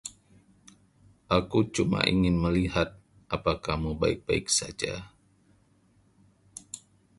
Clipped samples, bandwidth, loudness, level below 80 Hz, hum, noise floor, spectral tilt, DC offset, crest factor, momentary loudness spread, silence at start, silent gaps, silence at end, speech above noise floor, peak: under 0.1%; 11.5 kHz; -27 LUFS; -44 dBFS; none; -64 dBFS; -4.5 dB/octave; under 0.1%; 24 dB; 18 LU; 0.05 s; none; 0.4 s; 37 dB; -6 dBFS